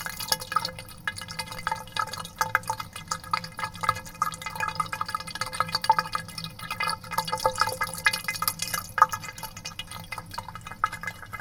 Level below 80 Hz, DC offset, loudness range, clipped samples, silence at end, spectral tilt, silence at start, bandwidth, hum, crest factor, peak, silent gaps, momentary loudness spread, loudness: -52 dBFS; under 0.1%; 4 LU; under 0.1%; 0 s; -1.5 dB/octave; 0 s; 19 kHz; none; 28 dB; -2 dBFS; none; 12 LU; -29 LUFS